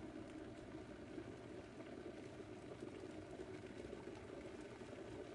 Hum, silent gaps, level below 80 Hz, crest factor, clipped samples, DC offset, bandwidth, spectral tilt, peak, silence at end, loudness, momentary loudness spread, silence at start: none; none; -70 dBFS; 14 dB; under 0.1%; under 0.1%; 11 kHz; -6 dB/octave; -38 dBFS; 0 s; -54 LUFS; 2 LU; 0 s